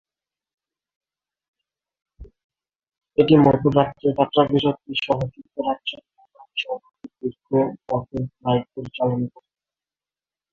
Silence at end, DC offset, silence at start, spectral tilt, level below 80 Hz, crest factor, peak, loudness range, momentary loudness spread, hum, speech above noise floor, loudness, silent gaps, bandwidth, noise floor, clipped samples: 1.25 s; under 0.1%; 2.2 s; -8.5 dB/octave; -54 dBFS; 22 dB; -2 dBFS; 7 LU; 15 LU; none; over 70 dB; -22 LUFS; 2.44-2.50 s; 7 kHz; under -90 dBFS; under 0.1%